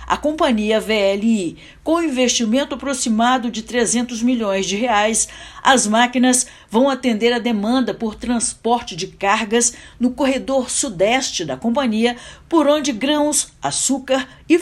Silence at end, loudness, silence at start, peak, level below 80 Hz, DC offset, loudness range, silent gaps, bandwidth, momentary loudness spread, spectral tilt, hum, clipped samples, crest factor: 0 s; -18 LUFS; 0 s; 0 dBFS; -48 dBFS; under 0.1%; 2 LU; none; 14 kHz; 6 LU; -2.5 dB/octave; none; under 0.1%; 18 dB